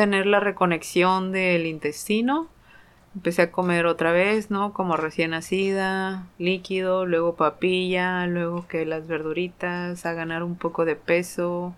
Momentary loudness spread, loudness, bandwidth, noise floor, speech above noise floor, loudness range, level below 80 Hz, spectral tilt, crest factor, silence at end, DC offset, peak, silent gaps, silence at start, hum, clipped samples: 8 LU; -24 LUFS; 15 kHz; -52 dBFS; 29 dB; 3 LU; -58 dBFS; -5.5 dB/octave; 18 dB; 0 s; under 0.1%; -6 dBFS; none; 0 s; none; under 0.1%